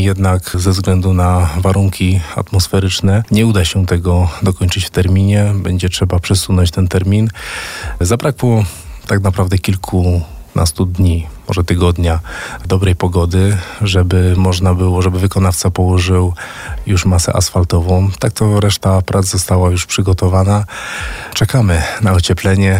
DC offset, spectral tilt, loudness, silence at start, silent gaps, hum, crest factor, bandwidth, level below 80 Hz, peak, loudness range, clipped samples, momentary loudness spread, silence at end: 0.3%; -5.5 dB/octave; -14 LUFS; 0 s; none; none; 10 dB; 16 kHz; -28 dBFS; -2 dBFS; 2 LU; under 0.1%; 6 LU; 0 s